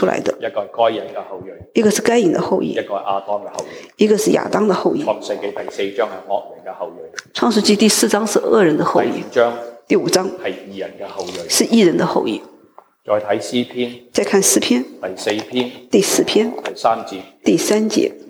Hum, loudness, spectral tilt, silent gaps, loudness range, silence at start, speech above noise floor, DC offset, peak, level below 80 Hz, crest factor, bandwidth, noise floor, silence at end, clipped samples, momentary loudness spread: none; -17 LUFS; -3.5 dB/octave; none; 3 LU; 0 s; 30 dB; under 0.1%; -2 dBFS; -62 dBFS; 16 dB; 20 kHz; -48 dBFS; 0 s; under 0.1%; 16 LU